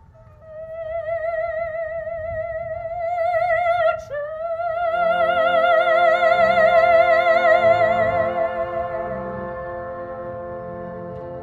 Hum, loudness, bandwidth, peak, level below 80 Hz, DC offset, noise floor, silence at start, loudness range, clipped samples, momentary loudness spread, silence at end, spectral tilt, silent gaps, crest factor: none; -19 LUFS; 7.6 kHz; -4 dBFS; -50 dBFS; under 0.1%; -45 dBFS; 0.4 s; 10 LU; under 0.1%; 16 LU; 0 s; -6 dB/octave; none; 16 dB